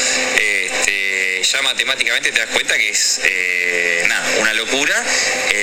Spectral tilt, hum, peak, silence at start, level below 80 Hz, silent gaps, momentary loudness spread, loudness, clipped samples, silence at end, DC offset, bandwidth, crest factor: 1 dB/octave; none; 0 dBFS; 0 s; -50 dBFS; none; 2 LU; -15 LUFS; under 0.1%; 0 s; under 0.1%; 18 kHz; 16 dB